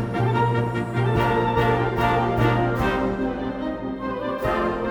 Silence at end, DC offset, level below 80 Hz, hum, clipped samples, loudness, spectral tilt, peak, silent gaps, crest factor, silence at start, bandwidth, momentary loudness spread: 0 s; under 0.1%; -38 dBFS; none; under 0.1%; -23 LUFS; -7.5 dB/octave; -8 dBFS; none; 14 dB; 0 s; 17.5 kHz; 7 LU